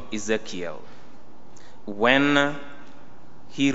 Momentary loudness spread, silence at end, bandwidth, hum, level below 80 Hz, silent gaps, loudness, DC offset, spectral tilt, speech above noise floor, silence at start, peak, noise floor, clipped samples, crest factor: 24 LU; 0 s; 8 kHz; none; -60 dBFS; none; -23 LUFS; 3%; -2.5 dB/octave; 27 dB; 0 s; -2 dBFS; -50 dBFS; under 0.1%; 24 dB